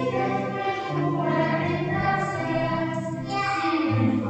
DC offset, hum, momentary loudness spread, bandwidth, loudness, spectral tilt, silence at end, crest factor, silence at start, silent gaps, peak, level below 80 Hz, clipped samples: under 0.1%; none; 4 LU; 8.8 kHz; -25 LUFS; -7 dB/octave; 0 s; 14 dB; 0 s; none; -12 dBFS; -54 dBFS; under 0.1%